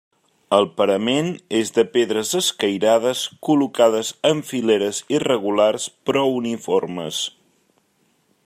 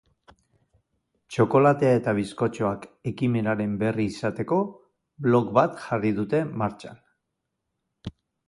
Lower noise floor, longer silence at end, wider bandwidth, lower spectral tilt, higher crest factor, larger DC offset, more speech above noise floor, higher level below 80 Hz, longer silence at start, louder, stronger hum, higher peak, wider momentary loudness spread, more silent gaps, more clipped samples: second, -64 dBFS vs -81 dBFS; first, 1.15 s vs 0.35 s; first, 15.5 kHz vs 11.5 kHz; second, -4 dB/octave vs -8 dB/octave; about the same, 18 dB vs 22 dB; neither; second, 45 dB vs 57 dB; second, -68 dBFS vs -58 dBFS; second, 0.5 s vs 1.3 s; first, -20 LUFS vs -24 LUFS; neither; about the same, -2 dBFS vs -4 dBFS; second, 7 LU vs 15 LU; neither; neither